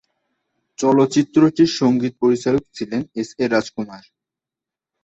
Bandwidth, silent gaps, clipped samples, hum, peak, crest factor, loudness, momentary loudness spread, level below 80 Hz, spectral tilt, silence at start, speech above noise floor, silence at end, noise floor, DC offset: 8.2 kHz; none; under 0.1%; none; -4 dBFS; 16 dB; -18 LUFS; 12 LU; -56 dBFS; -6 dB/octave; 0.8 s; 70 dB; 1.05 s; -88 dBFS; under 0.1%